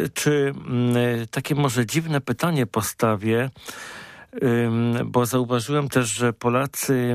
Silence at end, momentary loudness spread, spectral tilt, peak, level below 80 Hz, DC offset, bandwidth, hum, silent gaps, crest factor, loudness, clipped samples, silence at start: 0 s; 7 LU; -5.5 dB/octave; -6 dBFS; -58 dBFS; under 0.1%; 15.5 kHz; none; none; 16 dB; -22 LUFS; under 0.1%; 0 s